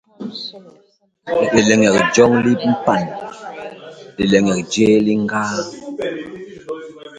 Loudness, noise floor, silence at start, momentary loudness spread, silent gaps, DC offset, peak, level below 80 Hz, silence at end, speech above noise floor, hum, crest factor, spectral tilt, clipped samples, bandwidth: -16 LUFS; -37 dBFS; 0.2 s; 20 LU; none; under 0.1%; 0 dBFS; -52 dBFS; 0 s; 20 dB; none; 18 dB; -5 dB/octave; under 0.1%; 9.4 kHz